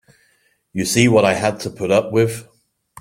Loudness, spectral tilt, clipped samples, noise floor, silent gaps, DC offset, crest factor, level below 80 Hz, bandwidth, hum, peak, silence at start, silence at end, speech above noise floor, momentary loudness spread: -17 LUFS; -5 dB/octave; under 0.1%; -61 dBFS; none; under 0.1%; 18 dB; -54 dBFS; 16.5 kHz; none; -2 dBFS; 0.75 s; 0.6 s; 45 dB; 12 LU